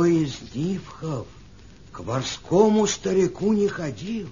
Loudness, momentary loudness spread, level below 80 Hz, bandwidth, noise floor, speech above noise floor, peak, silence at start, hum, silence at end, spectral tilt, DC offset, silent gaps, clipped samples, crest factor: -24 LUFS; 13 LU; -50 dBFS; 7.4 kHz; -47 dBFS; 24 dB; -4 dBFS; 0 s; none; 0 s; -5.5 dB/octave; 0.2%; none; under 0.1%; 20 dB